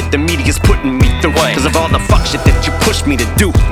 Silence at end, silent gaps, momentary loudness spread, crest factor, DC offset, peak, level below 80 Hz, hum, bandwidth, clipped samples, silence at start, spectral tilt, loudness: 0 s; none; 2 LU; 10 dB; under 0.1%; 0 dBFS; -16 dBFS; none; 17 kHz; under 0.1%; 0 s; -5 dB/octave; -12 LUFS